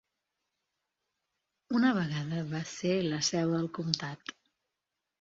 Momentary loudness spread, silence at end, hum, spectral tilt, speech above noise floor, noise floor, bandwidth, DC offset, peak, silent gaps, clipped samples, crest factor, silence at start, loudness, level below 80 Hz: 10 LU; 0.9 s; none; -4.5 dB/octave; 56 dB; -87 dBFS; 7.8 kHz; under 0.1%; -8 dBFS; none; under 0.1%; 26 dB; 1.7 s; -31 LUFS; -70 dBFS